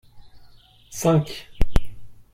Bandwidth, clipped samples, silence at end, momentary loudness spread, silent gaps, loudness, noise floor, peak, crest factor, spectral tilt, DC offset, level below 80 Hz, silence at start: 16 kHz; under 0.1%; 0.2 s; 13 LU; none; -24 LUFS; -49 dBFS; -4 dBFS; 18 dB; -6 dB/octave; under 0.1%; -30 dBFS; 0.15 s